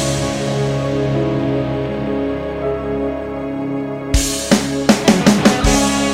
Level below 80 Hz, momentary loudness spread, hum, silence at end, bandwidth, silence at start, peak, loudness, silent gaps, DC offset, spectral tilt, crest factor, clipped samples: -28 dBFS; 10 LU; none; 0 s; 16.5 kHz; 0 s; 0 dBFS; -17 LUFS; none; under 0.1%; -4.5 dB/octave; 16 dB; under 0.1%